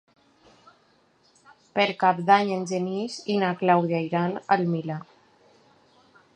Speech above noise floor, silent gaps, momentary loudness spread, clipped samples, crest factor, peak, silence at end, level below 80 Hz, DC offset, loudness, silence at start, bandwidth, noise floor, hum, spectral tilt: 39 dB; none; 10 LU; under 0.1%; 22 dB; -4 dBFS; 1.3 s; -74 dBFS; under 0.1%; -24 LUFS; 1.75 s; 9.6 kHz; -63 dBFS; none; -6 dB/octave